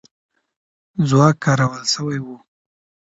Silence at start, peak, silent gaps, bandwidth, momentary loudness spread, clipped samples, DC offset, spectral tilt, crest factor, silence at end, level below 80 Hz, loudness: 0.95 s; 0 dBFS; none; 8 kHz; 15 LU; under 0.1%; under 0.1%; -5.5 dB/octave; 20 dB; 0.8 s; -58 dBFS; -18 LUFS